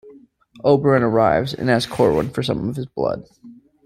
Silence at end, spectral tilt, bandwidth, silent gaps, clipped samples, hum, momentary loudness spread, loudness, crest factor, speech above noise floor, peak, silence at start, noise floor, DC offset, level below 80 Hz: 0.3 s; -6.5 dB/octave; 15.5 kHz; none; under 0.1%; none; 9 LU; -19 LUFS; 18 dB; 29 dB; -2 dBFS; 0.05 s; -47 dBFS; under 0.1%; -48 dBFS